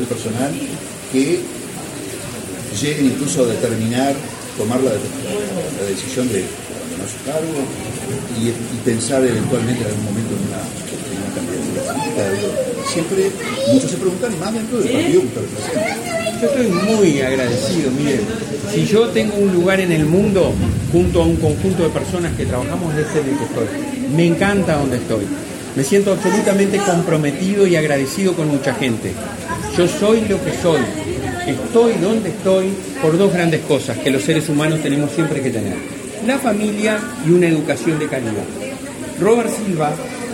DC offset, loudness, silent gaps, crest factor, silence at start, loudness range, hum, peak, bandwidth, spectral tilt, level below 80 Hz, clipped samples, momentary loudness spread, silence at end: under 0.1%; -18 LUFS; none; 16 dB; 0 s; 5 LU; none; -2 dBFS; 16.5 kHz; -5.5 dB/octave; -40 dBFS; under 0.1%; 10 LU; 0 s